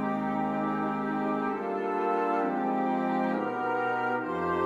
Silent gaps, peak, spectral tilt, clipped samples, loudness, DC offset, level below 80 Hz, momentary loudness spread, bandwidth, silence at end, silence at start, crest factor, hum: none; -16 dBFS; -8 dB/octave; under 0.1%; -29 LUFS; under 0.1%; -64 dBFS; 2 LU; 7.8 kHz; 0 s; 0 s; 14 dB; none